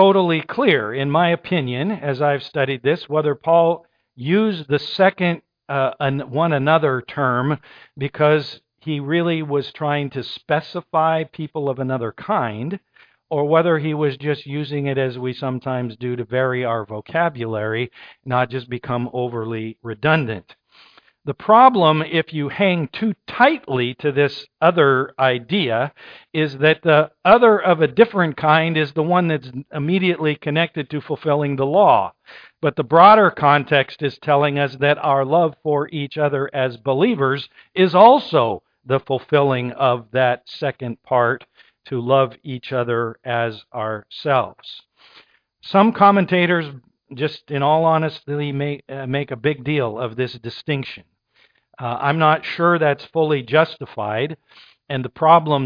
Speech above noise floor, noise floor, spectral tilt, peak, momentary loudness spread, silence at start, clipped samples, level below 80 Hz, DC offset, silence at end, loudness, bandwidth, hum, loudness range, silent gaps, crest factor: 41 dB; -59 dBFS; -8.5 dB/octave; 0 dBFS; 13 LU; 0 s; under 0.1%; -62 dBFS; under 0.1%; 0 s; -19 LUFS; 5.2 kHz; none; 7 LU; none; 18 dB